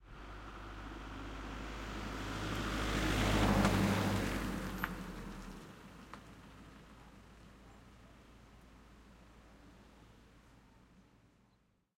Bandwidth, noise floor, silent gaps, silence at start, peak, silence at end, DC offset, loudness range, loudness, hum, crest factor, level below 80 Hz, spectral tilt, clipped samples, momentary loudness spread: 16.5 kHz; -74 dBFS; none; 0 s; -16 dBFS; 1.6 s; under 0.1%; 23 LU; -37 LUFS; none; 24 dB; -48 dBFS; -5 dB/octave; under 0.1%; 28 LU